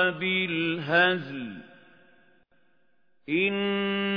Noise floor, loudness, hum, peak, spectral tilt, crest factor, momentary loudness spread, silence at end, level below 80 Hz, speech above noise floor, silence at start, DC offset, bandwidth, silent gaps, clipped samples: -73 dBFS; -26 LUFS; none; -8 dBFS; -7.5 dB/octave; 20 dB; 15 LU; 0 s; -76 dBFS; 46 dB; 0 s; under 0.1%; 5.2 kHz; none; under 0.1%